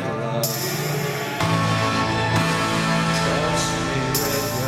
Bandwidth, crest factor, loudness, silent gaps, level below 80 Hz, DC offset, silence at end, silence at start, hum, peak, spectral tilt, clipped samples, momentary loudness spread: 16.5 kHz; 14 dB; -21 LUFS; none; -44 dBFS; under 0.1%; 0 s; 0 s; none; -8 dBFS; -4 dB/octave; under 0.1%; 4 LU